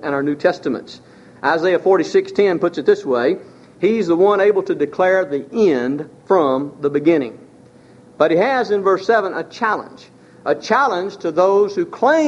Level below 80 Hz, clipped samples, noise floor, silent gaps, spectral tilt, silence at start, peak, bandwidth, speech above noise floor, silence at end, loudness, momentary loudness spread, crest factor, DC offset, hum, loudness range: -64 dBFS; under 0.1%; -45 dBFS; none; -6 dB/octave; 0 s; 0 dBFS; 8 kHz; 29 dB; 0 s; -17 LUFS; 8 LU; 16 dB; under 0.1%; none; 2 LU